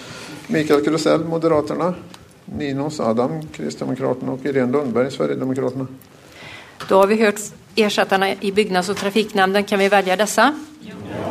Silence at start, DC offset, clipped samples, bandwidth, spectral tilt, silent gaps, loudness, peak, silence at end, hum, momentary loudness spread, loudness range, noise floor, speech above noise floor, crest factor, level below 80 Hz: 0 s; under 0.1%; under 0.1%; 15.5 kHz; -5 dB/octave; none; -19 LUFS; -2 dBFS; 0 s; none; 17 LU; 5 LU; -39 dBFS; 20 dB; 18 dB; -56 dBFS